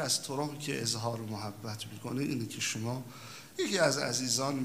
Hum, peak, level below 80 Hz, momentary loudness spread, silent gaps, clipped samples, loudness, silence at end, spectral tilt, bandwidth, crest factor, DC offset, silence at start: none; -12 dBFS; -72 dBFS; 13 LU; none; under 0.1%; -33 LUFS; 0 s; -3.5 dB/octave; 16 kHz; 22 dB; under 0.1%; 0 s